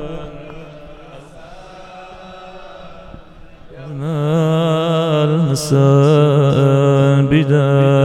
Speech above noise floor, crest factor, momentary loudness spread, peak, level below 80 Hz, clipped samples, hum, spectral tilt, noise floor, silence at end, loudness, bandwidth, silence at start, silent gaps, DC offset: 27 dB; 16 dB; 24 LU; 0 dBFS; -44 dBFS; under 0.1%; none; -7.5 dB/octave; -38 dBFS; 0 s; -14 LUFS; 12.5 kHz; 0 s; none; under 0.1%